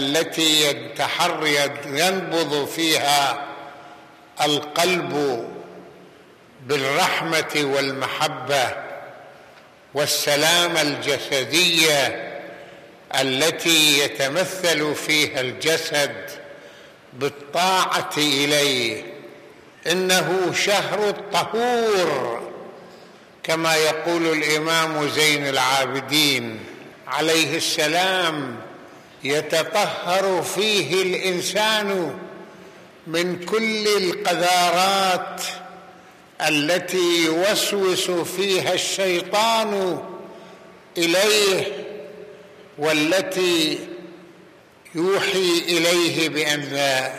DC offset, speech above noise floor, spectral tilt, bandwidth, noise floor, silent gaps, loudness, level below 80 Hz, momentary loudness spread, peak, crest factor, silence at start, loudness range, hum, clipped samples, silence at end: under 0.1%; 28 dB; -2.5 dB/octave; 15 kHz; -49 dBFS; none; -20 LUFS; -70 dBFS; 16 LU; -4 dBFS; 18 dB; 0 s; 4 LU; none; under 0.1%; 0 s